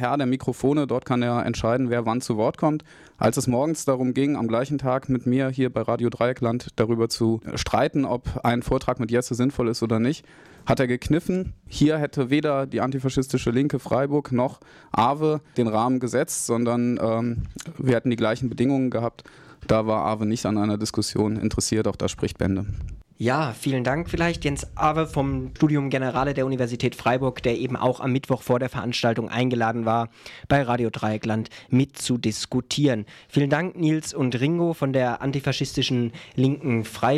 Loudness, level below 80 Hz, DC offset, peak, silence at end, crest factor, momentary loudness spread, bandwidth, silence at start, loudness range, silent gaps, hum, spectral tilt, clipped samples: -24 LUFS; -46 dBFS; under 0.1%; -8 dBFS; 0 s; 14 dB; 4 LU; 15 kHz; 0 s; 1 LU; none; none; -6 dB/octave; under 0.1%